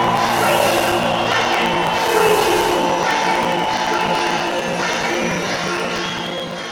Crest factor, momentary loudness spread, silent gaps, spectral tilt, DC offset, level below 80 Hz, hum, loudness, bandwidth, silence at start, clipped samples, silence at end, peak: 16 dB; 6 LU; none; -3.5 dB/octave; under 0.1%; -46 dBFS; none; -17 LUFS; over 20 kHz; 0 s; under 0.1%; 0 s; -2 dBFS